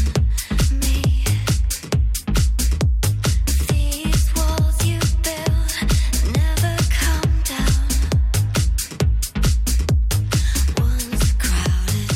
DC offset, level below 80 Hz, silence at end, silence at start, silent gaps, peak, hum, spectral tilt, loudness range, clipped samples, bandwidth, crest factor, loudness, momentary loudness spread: under 0.1%; -20 dBFS; 0 s; 0 s; none; -6 dBFS; none; -4.5 dB/octave; 1 LU; under 0.1%; 16.5 kHz; 12 dB; -20 LUFS; 2 LU